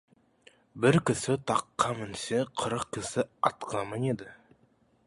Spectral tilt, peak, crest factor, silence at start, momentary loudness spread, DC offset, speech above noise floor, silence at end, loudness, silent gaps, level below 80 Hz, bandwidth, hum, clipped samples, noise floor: -5 dB/octave; -8 dBFS; 24 dB; 0.75 s; 9 LU; under 0.1%; 37 dB; 0.7 s; -30 LUFS; none; -60 dBFS; 11.5 kHz; none; under 0.1%; -67 dBFS